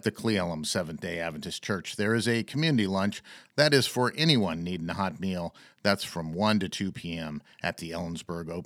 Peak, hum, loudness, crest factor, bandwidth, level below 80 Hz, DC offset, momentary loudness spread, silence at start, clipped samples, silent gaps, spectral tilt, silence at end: -6 dBFS; none; -29 LUFS; 22 dB; 16.5 kHz; -60 dBFS; under 0.1%; 12 LU; 0.05 s; under 0.1%; none; -5 dB/octave; 0 s